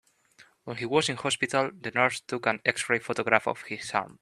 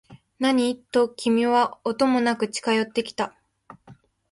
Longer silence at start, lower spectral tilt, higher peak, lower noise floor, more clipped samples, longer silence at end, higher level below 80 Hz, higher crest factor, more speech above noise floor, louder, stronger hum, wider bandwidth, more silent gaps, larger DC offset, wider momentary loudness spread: first, 0.65 s vs 0.1 s; about the same, -3.5 dB/octave vs -4 dB/octave; first, -2 dBFS vs -8 dBFS; first, -59 dBFS vs -52 dBFS; neither; second, 0.1 s vs 0.4 s; about the same, -70 dBFS vs -66 dBFS; first, 26 dB vs 16 dB; about the same, 31 dB vs 30 dB; second, -27 LUFS vs -23 LUFS; neither; first, 13 kHz vs 11.5 kHz; neither; neither; about the same, 9 LU vs 7 LU